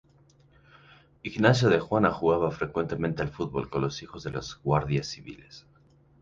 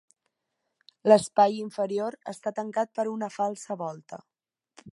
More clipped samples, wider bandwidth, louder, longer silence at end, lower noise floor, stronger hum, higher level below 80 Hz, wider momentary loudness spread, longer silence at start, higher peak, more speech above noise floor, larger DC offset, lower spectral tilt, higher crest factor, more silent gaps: neither; second, 7.8 kHz vs 11.5 kHz; about the same, -27 LUFS vs -27 LUFS; first, 0.6 s vs 0 s; second, -60 dBFS vs -81 dBFS; neither; first, -52 dBFS vs -74 dBFS; about the same, 15 LU vs 15 LU; first, 1.25 s vs 1.05 s; second, -8 dBFS vs -4 dBFS; second, 33 dB vs 55 dB; neither; first, -6.5 dB/octave vs -5 dB/octave; about the same, 20 dB vs 24 dB; neither